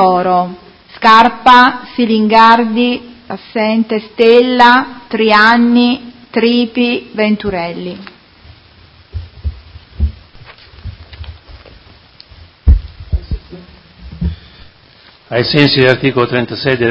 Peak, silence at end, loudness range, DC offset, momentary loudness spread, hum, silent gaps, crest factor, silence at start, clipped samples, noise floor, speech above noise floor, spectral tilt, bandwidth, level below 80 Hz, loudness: 0 dBFS; 0 s; 18 LU; under 0.1%; 21 LU; none; none; 12 dB; 0 s; 0.5%; -43 dBFS; 33 dB; -7 dB/octave; 8 kHz; -26 dBFS; -11 LUFS